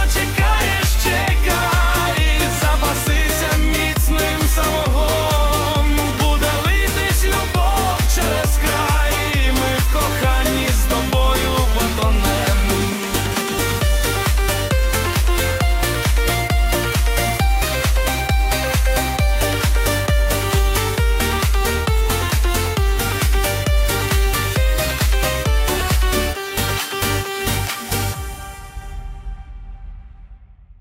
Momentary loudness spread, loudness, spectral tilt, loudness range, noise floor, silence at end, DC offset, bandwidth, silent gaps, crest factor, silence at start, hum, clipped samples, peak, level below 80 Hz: 4 LU; -18 LUFS; -4 dB/octave; 2 LU; -42 dBFS; 0.35 s; under 0.1%; 16.5 kHz; none; 14 dB; 0 s; none; under 0.1%; -4 dBFS; -20 dBFS